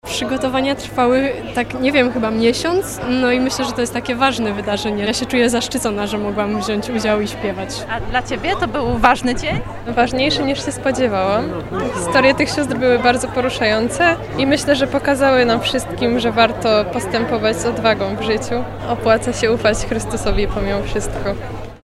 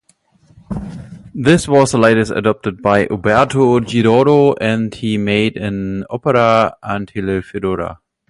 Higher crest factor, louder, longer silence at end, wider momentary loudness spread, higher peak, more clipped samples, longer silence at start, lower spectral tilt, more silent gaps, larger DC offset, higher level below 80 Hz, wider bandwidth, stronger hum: about the same, 18 dB vs 14 dB; second, -17 LUFS vs -14 LUFS; second, 0.05 s vs 0.35 s; second, 8 LU vs 14 LU; about the same, 0 dBFS vs 0 dBFS; neither; second, 0.05 s vs 0.7 s; second, -4.5 dB/octave vs -6 dB/octave; neither; neither; first, -34 dBFS vs -42 dBFS; first, 15.5 kHz vs 11.5 kHz; neither